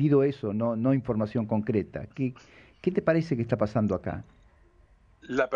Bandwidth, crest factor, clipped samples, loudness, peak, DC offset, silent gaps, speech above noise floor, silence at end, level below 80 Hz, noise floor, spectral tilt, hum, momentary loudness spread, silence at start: 7.2 kHz; 16 dB; under 0.1%; -28 LUFS; -12 dBFS; under 0.1%; none; 32 dB; 0 s; -56 dBFS; -59 dBFS; -9 dB/octave; none; 8 LU; 0 s